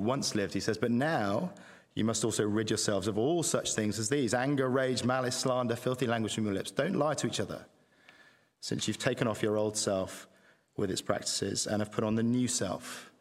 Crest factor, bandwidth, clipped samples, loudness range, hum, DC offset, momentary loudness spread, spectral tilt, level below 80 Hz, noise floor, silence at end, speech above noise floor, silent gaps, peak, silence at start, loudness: 20 dB; 16 kHz; under 0.1%; 4 LU; none; under 0.1%; 7 LU; -4 dB/octave; -66 dBFS; -62 dBFS; 0.1 s; 31 dB; none; -10 dBFS; 0 s; -31 LUFS